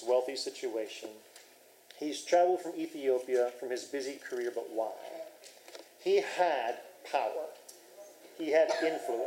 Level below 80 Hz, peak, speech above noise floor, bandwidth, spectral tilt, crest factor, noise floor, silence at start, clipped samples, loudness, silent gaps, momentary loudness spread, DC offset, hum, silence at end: under -90 dBFS; -14 dBFS; 27 dB; 16 kHz; -2.5 dB/octave; 18 dB; -59 dBFS; 0 s; under 0.1%; -33 LUFS; none; 23 LU; under 0.1%; none; 0 s